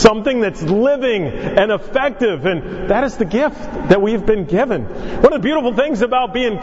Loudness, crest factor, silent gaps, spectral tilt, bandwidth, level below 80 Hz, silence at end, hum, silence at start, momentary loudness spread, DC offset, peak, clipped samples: -16 LUFS; 16 dB; none; -6 dB/octave; 8 kHz; -34 dBFS; 0 s; none; 0 s; 6 LU; under 0.1%; 0 dBFS; 0.2%